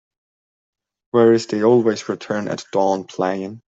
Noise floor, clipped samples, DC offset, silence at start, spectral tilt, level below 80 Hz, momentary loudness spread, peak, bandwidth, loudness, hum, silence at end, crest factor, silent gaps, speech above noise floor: under -90 dBFS; under 0.1%; under 0.1%; 1.15 s; -6 dB/octave; -66 dBFS; 10 LU; -4 dBFS; 7.8 kHz; -19 LUFS; none; 0.15 s; 16 dB; none; over 72 dB